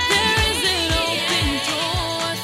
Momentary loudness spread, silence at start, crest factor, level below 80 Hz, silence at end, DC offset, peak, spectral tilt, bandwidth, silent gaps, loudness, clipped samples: 5 LU; 0 s; 16 dB; -34 dBFS; 0 s; under 0.1%; -4 dBFS; -2.5 dB/octave; 16.5 kHz; none; -19 LUFS; under 0.1%